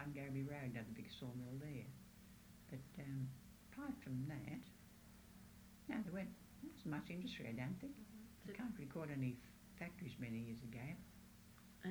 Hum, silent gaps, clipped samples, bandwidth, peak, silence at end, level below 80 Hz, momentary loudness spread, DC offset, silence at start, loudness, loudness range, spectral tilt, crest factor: none; none; under 0.1%; over 20 kHz; -32 dBFS; 0 s; -70 dBFS; 15 LU; under 0.1%; 0 s; -51 LUFS; 3 LU; -6.5 dB/octave; 20 dB